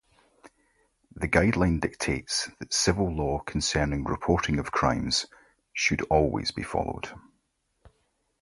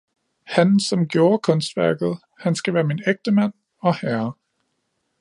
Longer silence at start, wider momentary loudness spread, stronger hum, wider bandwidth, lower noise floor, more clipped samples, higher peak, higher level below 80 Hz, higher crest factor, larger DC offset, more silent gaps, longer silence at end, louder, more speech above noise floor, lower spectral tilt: about the same, 0.45 s vs 0.5 s; about the same, 7 LU vs 8 LU; neither; about the same, 11.5 kHz vs 11.5 kHz; about the same, -74 dBFS vs -73 dBFS; neither; second, -6 dBFS vs -2 dBFS; first, -42 dBFS vs -66 dBFS; about the same, 22 dB vs 18 dB; neither; neither; second, 0.55 s vs 0.9 s; second, -27 LUFS vs -21 LUFS; second, 48 dB vs 53 dB; second, -4 dB/octave vs -6 dB/octave